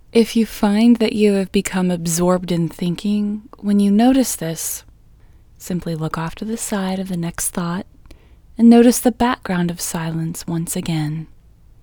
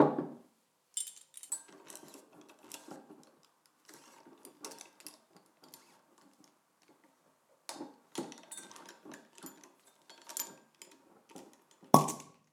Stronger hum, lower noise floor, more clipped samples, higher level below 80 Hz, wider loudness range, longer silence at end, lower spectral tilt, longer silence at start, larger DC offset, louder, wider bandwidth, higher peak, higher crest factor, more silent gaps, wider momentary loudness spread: neither; second, -46 dBFS vs -72 dBFS; neither; first, -44 dBFS vs -84 dBFS; second, 7 LU vs 19 LU; first, 0.55 s vs 0.3 s; about the same, -5.5 dB/octave vs -4.5 dB/octave; first, 0.15 s vs 0 s; neither; first, -18 LUFS vs -36 LUFS; first, over 20 kHz vs 18 kHz; about the same, 0 dBFS vs -2 dBFS; second, 18 dB vs 38 dB; neither; second, 12 LU vs 22 LU